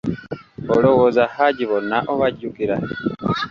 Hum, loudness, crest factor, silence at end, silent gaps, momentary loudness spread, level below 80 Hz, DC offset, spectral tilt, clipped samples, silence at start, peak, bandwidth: none; -19 LUFS; 18 dB; 0 s; none; 12 LU; -50 dBFS; under 0.1%; -7.5 dB/octave; under 0.1%; 0.05 s; -2 dBFS; 7 kHz